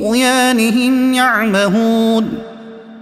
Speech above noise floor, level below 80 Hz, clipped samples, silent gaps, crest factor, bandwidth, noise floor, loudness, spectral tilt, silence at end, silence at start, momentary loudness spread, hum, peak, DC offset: 20 dB; -50 dBFS; under 0.1%; none; 14 dB; 15.5 kHz; -33 dBFS; -13 LUFS; -4 dB/octave; 0 s; 0 s; 9 LU; none; 0 dBFS; under 0.1%